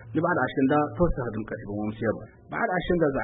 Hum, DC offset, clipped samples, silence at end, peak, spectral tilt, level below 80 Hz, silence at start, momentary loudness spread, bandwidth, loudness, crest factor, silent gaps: none; under 0.1%; under 0.1%; 0 s; -10 dBFS; -11.5 dB/octave; -40 dBFS; 0 s; 10 LU; 4 kHz; -27 LUFS; 16 dB; none